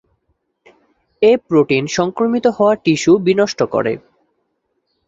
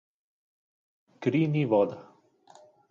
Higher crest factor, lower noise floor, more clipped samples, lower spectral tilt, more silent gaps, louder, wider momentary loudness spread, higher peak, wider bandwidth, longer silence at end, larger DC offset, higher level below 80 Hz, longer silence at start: about the same, 16 dB vs 20 dB; first, -69 dBFS vs -58 dBFS; neither; second, -5.5 dB/octave vs -9 dB/octave; neither; first, -15 LUFS vs -27 LUFS; about the same, 6 LU vs 8 LU; first, -2 dBFS vs -12 dBFS; about the same, 7.8 kHz vs 7.4 kHz; first, 1.1 s vs 0.9 s; neither; first, -56 dBFS vs -76 dBFS; about the same, 1.2 s vs 1.2 s